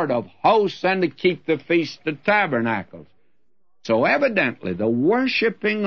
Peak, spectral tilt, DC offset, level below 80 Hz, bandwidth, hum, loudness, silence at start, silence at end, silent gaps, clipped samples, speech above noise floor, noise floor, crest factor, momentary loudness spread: -4 dBFS; -6.5 dB/octave; 0.2%; -66 dBFS; 6.8 kHz; none; -21 LUFS; 0 s; 0 s; none; under 0.1%; 54 dB; -74 dBFS; 18 dB; 7 LU